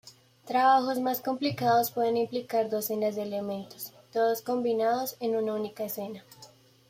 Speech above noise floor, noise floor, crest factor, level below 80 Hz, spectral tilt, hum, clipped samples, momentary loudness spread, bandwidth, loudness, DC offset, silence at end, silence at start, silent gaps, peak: 27 dB; -55 dBFS; 18 dB; -76 dBFS; -4.5 dB/octave; none; under 0.1%; 12 LU; 16 kHz; -28 LUFS; under 0.1%; 0.45 s; 0.05 s; none; -12 dBFS